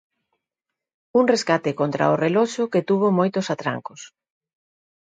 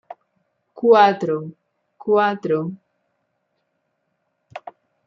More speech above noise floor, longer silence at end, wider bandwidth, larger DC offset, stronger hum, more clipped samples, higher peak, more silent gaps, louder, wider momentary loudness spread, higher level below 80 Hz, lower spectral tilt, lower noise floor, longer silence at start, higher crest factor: first, 65 dB vs 55 dB; first, 0.95 s vs 0.5 s; first, 9.4 kHz vs 6.8 kHz; neither; neither; neither; about the same, -4 dBFS vs -2 dBFS; neither; second, -21 LUFS vs -18 LUFS; second, 8 LU vs 25 LU; about the same, -70 dBFS vs -74 dBFS; about the same, -6 dB/octave vs -7 dB/octave; first, -85 dBFS vs -72 dBFS; first, 1.15 s vs 0.75 s; about the same, 20 dB vs 20 dB